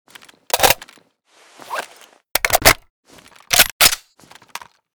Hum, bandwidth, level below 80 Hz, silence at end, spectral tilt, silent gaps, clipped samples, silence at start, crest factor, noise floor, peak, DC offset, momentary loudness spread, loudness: none; over 20 kHz; -40 dBFS; 1 s; -0.5 dB/octave; 2.90-3.03 s, 3.72-3.80 s; under 0.1%; 0.55 s; 20 dB; -54 dBFS; 0 dBFS; under 0.1%; 24 LU; -15 LUFS